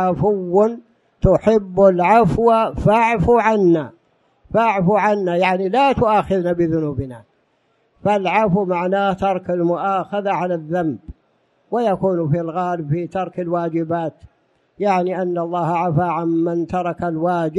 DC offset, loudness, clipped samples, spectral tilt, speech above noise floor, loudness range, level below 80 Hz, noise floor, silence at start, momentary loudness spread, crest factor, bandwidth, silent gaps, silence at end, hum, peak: under 0.1%; -18 LUFS; under 0.1%; -8 dB/octave; 46 dB; 6 LU; -40 dBFS; -63 dBFS; 0 s; 8 LU; 16 dB; 11.5 kHz; none; 0 s; none; -2 dBFS